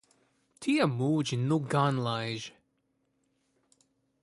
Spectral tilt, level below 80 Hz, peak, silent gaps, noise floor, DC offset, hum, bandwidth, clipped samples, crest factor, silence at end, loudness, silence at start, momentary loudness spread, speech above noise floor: -6 dB/octave; -70 dBFS; -12 dBFS; none; -76 dBFS; under 0.1%; none; 11.5 kHz; under 0.1%; 20 dB; 1.75 s; -29 LUFS; 0.6 s; 10 LU; 47 dB